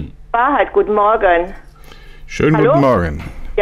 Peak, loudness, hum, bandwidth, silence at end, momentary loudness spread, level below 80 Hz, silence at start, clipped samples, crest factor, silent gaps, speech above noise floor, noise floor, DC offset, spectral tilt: -2 dBFS; -14 LUFS; none; 12 kHz; 0 s; 13 LU; -32 dBFS; 0 s; under 0.1%; 12 dB; none; 23 dB; -36 dBFS; under 0.1%; -7.5 dB/octave